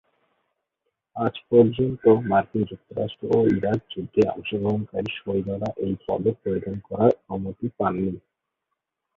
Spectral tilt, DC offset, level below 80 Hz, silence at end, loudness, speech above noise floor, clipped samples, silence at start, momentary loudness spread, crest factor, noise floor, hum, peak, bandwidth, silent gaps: -9 dB/octave; under 0.1%; -52 dBFS; 1 s; -24 LUFS; 58 dB; under 0.1%; 1.15 s; 11 LU; 20 dB; -81 dBFS; none; -4 dBFS; 7 kHz; none